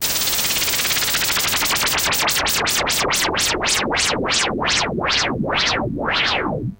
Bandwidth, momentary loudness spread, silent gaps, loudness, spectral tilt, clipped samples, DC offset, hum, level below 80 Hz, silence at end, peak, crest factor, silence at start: 17.5 kHz; 2 LU; none; -17 LUFS; -1.5 dB/octave; under 0.1%; under 0.1%; none; -40 dBFS; 0.05 s; -6 dBFS; 14 dB; 0 s